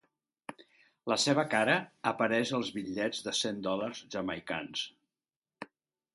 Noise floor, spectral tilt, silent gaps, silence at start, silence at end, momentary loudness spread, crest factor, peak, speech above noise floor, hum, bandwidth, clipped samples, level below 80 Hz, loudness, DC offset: under -90 dBFS; -3.5 dB/octave; 5.36-5.42 s; 0.5 s; 0.5 s; 21 LU; 22 dB; -12 dBFS; over 58 dB; none; 11.5 kHz; under 0.1%; -72 dBFS; -32 LUFS; under 0.1%